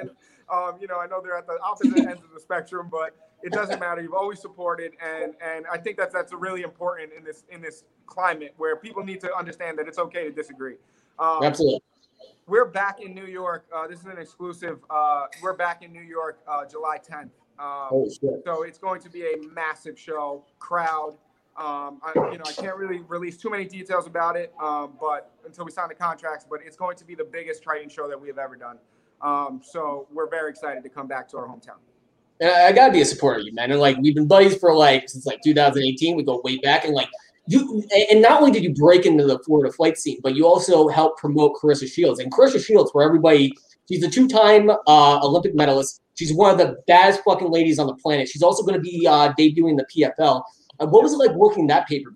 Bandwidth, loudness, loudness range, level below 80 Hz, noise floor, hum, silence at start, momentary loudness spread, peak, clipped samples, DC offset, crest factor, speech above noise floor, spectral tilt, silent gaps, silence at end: 12 kHz; -19 LUFS; 14 LU; -64 dBFS; -64 dBFS; none; 0 s; 19 LU; 0 dBFS; under 0.1%; under 0.1%; 20 dB; 44 dB; -5 dB/octave; none; 0.1 s